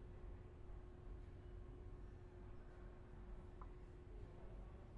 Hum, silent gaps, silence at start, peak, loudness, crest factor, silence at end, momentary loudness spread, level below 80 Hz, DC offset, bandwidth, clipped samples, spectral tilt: none; none; 0 s; -42 dBFS; -59 LUFS; 12 dB; 0 s; 2 LU; -58 dBFS; under 0.1%; 7.8 kHz; under 0.1%; -8.5 dB/octave